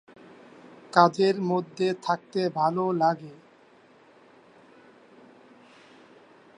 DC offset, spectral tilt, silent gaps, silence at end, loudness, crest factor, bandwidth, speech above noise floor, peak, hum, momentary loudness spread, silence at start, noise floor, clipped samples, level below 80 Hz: under 0.1%; -6.5 dB/octave; none; 3.25 s; -25 LUFS; 26 dB; 10.5 kHz; 32 dB; -2 dBFS; none; 8 LU; 0.95 s; -56 dBFS; under 0.1%; -78 dBFS